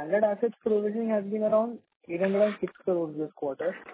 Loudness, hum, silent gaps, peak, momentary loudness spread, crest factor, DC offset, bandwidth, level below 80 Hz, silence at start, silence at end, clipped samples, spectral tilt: -28 LUFS; none; 1.96-2.00 s; -14 dBFS; 9 LU; 14 dB; under 0.1%; 4 kHz; -74 dBFS; 0 s; 0 s; under 0.1%; -11 dB/octave